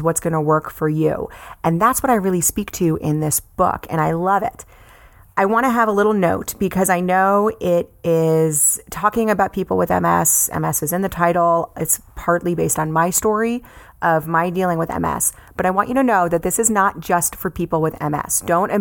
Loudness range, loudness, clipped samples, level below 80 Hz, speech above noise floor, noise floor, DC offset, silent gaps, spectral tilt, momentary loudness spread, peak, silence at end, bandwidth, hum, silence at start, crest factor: 2 LU; -18 LUFS; under 0.1%; -44 dBFS; 28 dB; -46 dBFS; under 0.1%; none; -5 dB/octave; 6 LU; -2 dBFS; 0 s; 18.5 kHz; none; 0 s; 16 dB